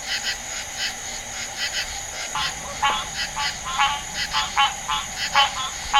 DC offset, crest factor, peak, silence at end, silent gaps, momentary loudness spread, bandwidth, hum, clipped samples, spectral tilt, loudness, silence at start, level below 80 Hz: under 0.1%; 24 dB; -2 dBFS; 0 s; none; 9 LU; 16 kHz; none; under 0.1%; 0.5 dB/octave; -23 LUFS; 0 s; -44 dBFS